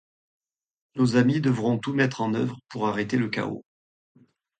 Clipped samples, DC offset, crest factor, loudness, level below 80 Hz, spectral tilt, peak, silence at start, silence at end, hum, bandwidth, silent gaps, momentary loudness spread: under 0.1%; under 0.1%; 18 dB; -25 LUFS; -64 dBFS; -7 dB/octave; -8 dBFS; 0.95 s; 1 s; none; 9.2 kHz; none; 10 LU